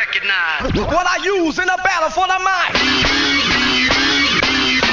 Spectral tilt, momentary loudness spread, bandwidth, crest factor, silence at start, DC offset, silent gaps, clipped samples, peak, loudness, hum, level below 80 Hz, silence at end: -2.5 dB/octave; 4 LU; 7.6 kHz; 14 dB; 0 s; under 0.1%; none; under 0.1%; -2 dBFS; -14 LUFS; none; -34 dBFS; 0 s